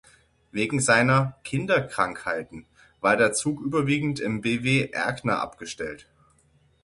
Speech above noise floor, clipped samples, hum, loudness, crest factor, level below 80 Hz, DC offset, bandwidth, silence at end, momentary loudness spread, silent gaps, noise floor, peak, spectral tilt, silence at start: 38 dB; under 0.1%; none; -24 LUFS; 22 dB; -56 dBFS; under 0.1%; 11.5 kHz; 0.85 s; 14 LU; none; -62 dBFS; -4 dBFS; -4.5 dB/octave; 0.55 s